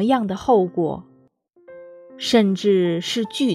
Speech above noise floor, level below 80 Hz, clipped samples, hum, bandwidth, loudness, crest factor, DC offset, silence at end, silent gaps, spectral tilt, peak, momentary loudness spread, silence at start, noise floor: 38 dB; -58 dBFS; under 0.1%; none; 14 kHz; -20 LUFS; 18 dB; under 0.1%; 0 s; none; -5.5 dB/octave; -2 dBFS; 8 LU; 0 s; -57 dBFS